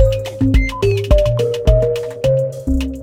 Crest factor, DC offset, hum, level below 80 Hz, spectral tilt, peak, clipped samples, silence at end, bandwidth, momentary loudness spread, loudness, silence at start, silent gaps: 14 dB; under 0.1%; none; -20 dBFS; -7 dB/octave; 0 dBFS; under 0.1%; 0 s; 16 kHz; 5 LU; -16 LUFS; 0 s; none